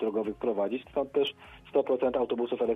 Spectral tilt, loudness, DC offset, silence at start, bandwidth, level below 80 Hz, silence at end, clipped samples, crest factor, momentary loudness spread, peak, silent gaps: -7 dB/octave; -30 LUFS; under 0.1%; 0 s; 4 kHz; -62 dBFS; 0 s; under 0.1%; 16 dB; 5 LU; -14 dBFS; none